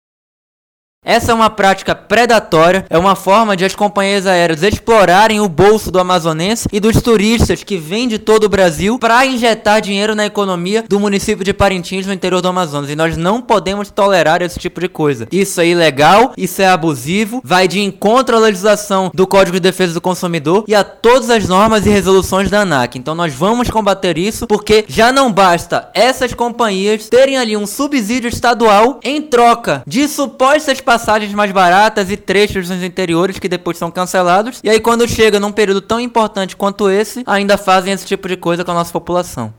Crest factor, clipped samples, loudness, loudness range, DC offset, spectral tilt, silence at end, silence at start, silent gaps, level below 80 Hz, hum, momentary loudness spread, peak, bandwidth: 10 dB; under 0.1%; -12 LUFS; 3 LU; under 0.1%; -4.5 dB/octave; 0.05 s; 1.05 s; none; -36 dBFS; none; 7 LU; -2 dBFS; 18 kHz